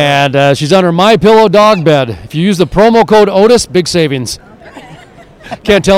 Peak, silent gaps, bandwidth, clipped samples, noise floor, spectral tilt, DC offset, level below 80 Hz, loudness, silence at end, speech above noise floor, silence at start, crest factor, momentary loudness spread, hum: 0 dBFS; none; 16 kHz; 1%; -36 dBFS; -5 dB/octave; under 0.1%; -36 dBFS; -8 LUFS; 0 s; 28 dB; 0 s; 8 dB; 11 LU; none